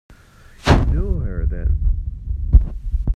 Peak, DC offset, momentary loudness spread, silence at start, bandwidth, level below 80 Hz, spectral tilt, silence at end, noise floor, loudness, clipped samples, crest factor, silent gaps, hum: 0 dBFS; under 0.1%; 10 LU; 0.1 s; 9.4 kHz; -20 dBFS; -7 dB/octave; 0 s; -45 dBFS; -21 LUFS; under 0.1%; 18 dB; none; none